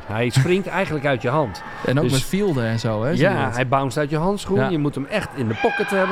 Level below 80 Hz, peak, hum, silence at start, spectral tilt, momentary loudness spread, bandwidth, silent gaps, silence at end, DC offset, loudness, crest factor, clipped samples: -40 dBFS; -4 dBFS; none; 0 s; -6 dB/octave; 4 LU; 15.5 kHz; none; 0 s; under 0.1%; -21 LUFS; 16 dB; under 0.1%